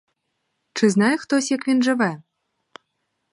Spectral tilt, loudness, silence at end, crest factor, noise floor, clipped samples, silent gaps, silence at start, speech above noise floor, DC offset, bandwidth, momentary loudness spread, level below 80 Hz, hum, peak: -4.5 dB/octave; -20 LUFS; 1.1 s; 18 dB; -75 dBFS; under 0.1%; none; 0.75 s; 56 dB; under 0.1%; 11.5 kHz; 9 LU; -72 dBFS; none; -4 dBFS